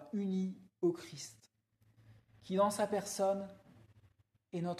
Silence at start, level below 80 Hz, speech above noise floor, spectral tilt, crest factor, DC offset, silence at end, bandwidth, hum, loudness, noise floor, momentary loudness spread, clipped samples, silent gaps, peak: 0 s; -78 dBFS; 37 dB; -5.5 dB/octave; 18 dB; under 0.1%; 0 s; 14.5 kHz; none; -37 LUFS; -73 dBFS; 15 LU; under 0.1%; none; -20 dBFS